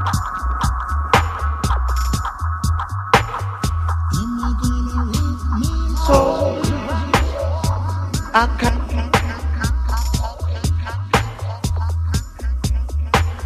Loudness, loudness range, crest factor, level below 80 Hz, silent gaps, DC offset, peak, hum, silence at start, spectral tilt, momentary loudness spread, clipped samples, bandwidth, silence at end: -20 LUFS; 3 LU; 18 dB; -22 dBFS; none; under 0.1%; 0 dBFS; none; 0 s; -5.5 dB/octave; 6 LU; under 0.1%; 15.5 kHz; 0 s